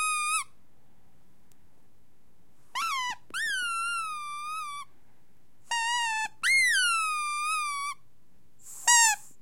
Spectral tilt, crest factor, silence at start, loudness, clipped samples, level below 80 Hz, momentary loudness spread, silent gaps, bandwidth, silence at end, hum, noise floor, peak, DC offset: 3.5 dB/octave; 24 dB; 0 s; -26 LUFS; under 0.1%; -74 dBFS; 16 LU; none; 16.5 kHz; 0.15 s; none; -67 dBFS; -8 dBFS; 0.5%